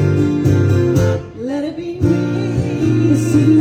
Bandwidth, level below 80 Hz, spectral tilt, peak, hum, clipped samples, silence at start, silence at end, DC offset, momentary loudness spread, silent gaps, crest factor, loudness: 14.5 kHz; -38 dBFS; -8 dB/octave; -2 dBFS; none; under 0.1%; 0 s; 0 s; under 0.1%; 9 LU; none; 12 dB; -16 LUFS